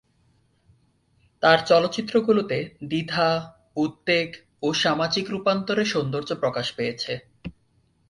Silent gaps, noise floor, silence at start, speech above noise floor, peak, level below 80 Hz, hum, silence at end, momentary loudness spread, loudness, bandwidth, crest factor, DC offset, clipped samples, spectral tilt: none; -65 dBFS; 1.4 s; 42 dB; -4 dBFS; -60 dBFS; none; 0.6 s; 12 LU; -23 LUFS; 11.5 kHz; 22 dB; under 0.1%; under 0.1%; -5 dB/octave